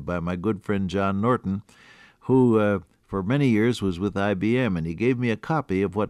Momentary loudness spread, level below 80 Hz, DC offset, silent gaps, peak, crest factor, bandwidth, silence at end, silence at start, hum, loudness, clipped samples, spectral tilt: 9 LU; -54 dBFS; under 0.1%; none; -10 dBFS; 14 dB; 12 kHz; 0 s; 0 s; none; -24 LUFS; under 0.1%; -8 dB/octave